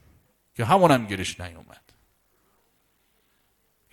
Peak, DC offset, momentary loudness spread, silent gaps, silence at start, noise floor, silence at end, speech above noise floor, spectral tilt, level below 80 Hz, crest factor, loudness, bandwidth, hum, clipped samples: -6 dBFS; under 0.1%; 22 LU; none; 0.6 s; -68 dBFS; 2.3 s; 46 dB; -5.5 dB/octave; -58 dBFS; 22 dB; -22 LUFS; 18 kHz; none; under 0.1%